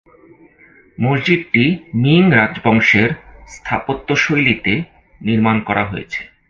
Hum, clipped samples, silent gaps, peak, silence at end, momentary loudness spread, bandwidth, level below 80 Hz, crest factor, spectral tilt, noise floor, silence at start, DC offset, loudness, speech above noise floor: none; under 0.1%; none; 0 dBFS; 0.25 s; 13 LU; 7.4 kHz; -44 dBFS; 16 dB; -6.5 dB/octave; -48 dBFS; 1 s; under 0.1%; -15 LUFS; 33 dB